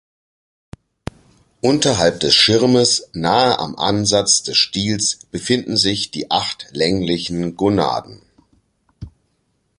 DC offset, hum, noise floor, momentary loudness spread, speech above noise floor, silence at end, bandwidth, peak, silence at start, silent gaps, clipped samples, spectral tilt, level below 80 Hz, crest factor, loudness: under 0.1%; none; -66 dBFS; 11 LU; 49 dB; 0.7 s; 11.5 kHz; 0 dBFS; 1.65 s; none; under 0.1%; -3.5 dB/octave; -46 dBFS; 18 dB; -16 LUFS